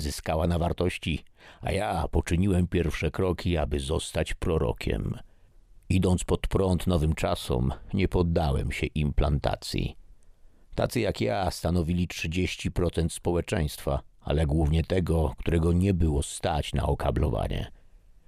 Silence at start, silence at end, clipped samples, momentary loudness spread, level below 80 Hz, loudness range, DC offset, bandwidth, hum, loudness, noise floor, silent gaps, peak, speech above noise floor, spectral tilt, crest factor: 0 s; 0.55 s; under 0.1%; 7 LU; -34 dBFS; 3 LU; under 0.1%; 15.5 kHz; none; -28 LUFS; -53 dBFS; none; -10 dBFS; 27 dB; -6.5 dB/octave; 16 dB